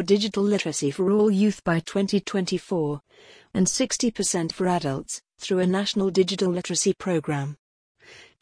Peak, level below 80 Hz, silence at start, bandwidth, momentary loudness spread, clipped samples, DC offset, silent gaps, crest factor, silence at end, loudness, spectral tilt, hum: -8 dBFS; -58 dBFS; 0 s; 10.5 kHz; 8 LU; under 0.1%; under 0.1%; 7.59-7.95 s; 16 dB; 0.2 s; -24 LUFS; -4.5 dB/octave; none